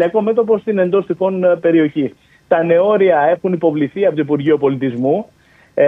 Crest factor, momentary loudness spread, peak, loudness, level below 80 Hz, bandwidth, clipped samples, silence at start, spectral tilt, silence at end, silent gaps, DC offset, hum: 14 dB; 6 LU; 0 dBFS; -15 LUFS; -60 dBFS; 3.9 kHz; under 0.1%; 0 s; -9.5 dB/octave; 0 s; none; under 0.1%; none